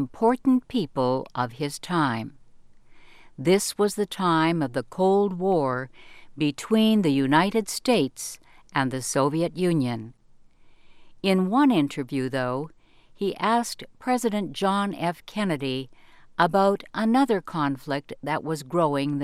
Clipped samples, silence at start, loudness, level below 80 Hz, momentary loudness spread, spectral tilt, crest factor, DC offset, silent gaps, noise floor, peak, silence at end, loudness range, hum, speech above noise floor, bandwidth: under 0.1%; 0 s; -25 LUFS; -58 dBFS; 11 LU; -5.5 dB/octave; 20 dB; under 0.1%; none; -52 dBFS; -6 dBFS; 0 s; 4 LU; none; 28 dB; 15.5 kHz